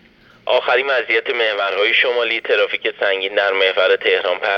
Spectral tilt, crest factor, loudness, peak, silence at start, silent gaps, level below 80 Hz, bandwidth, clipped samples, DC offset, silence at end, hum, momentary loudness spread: -3 dB/octave; 14 dB; -16 LUFS; -4 dBFS; 0.45 s; none; -66 dBFS; 6.4 kHz; under 0.1%; under 0.1%; 0 s; none; 4 LU